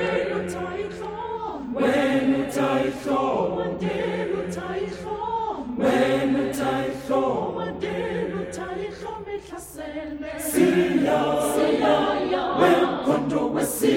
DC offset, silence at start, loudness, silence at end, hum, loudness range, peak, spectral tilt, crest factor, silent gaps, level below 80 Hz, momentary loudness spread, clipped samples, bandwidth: under 0.1%; 0 s; -24 LUFS; 0 s; none; 6 LU; -6 dBFS; -5 dB/octave; 18 dB; none; -52 dBFS; 12 LU; under 0.1%; 17.5 kHz